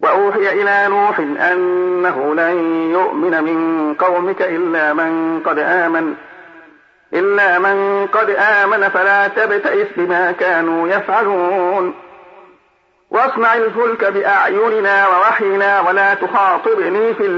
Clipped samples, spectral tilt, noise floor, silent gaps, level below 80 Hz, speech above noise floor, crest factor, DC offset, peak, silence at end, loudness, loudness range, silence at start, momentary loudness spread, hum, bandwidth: under 0.1%; -6.5 dB/octave; -56 dBFS; none; -68 dBFS; 42 dB; 12 dB; under 0.1%; -4 dBFS; 0 s; -14 LUFS; 4 LU; 0 s; 5 LU; none; 7.2 kHz